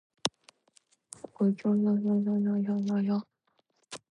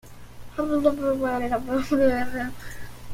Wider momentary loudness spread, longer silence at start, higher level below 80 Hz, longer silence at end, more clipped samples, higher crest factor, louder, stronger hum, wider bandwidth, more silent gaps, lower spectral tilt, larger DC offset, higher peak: first, 20 LU vs 17 LU; first, 0.25 s vs 0.05 s; second, -76 dBFS vs -44 dBFS; first, 0.15 s vs 0 s; neither; first, 24 dB vs 18 dB; second, -29 LUFS vs -25 LUFS; second, none vs 60 Hz at -45 dBFS; second, 11 kHz vs 16.5 kHz; neither; about the same, -6.5 dB/octave vs -6 dB/octave; neither; about the same, -6 dBFS vs -8 dBFS